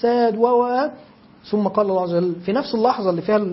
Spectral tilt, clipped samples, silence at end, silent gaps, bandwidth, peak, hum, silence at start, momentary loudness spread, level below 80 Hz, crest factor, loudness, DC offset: -10.5 dB/octave; under 0.1%; 0 s; none; 5.8 kHz; -4 dBFS; none; 0 s; 6 LU; -62 dBFS; 16 dB; -20 LUFS; under 0.1%